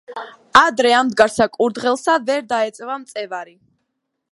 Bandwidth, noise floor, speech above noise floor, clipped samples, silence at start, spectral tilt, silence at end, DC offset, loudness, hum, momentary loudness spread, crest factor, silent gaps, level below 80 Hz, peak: 11.5 kHz; -75 dBFS; 57 dB; under 0.1%; 0.1 s; -3 dB/octave; 0.85 s; under 0.1%; -17 LUFS; none; 16 LU; 18 dB; none; -56 dBFS; 0 dBFS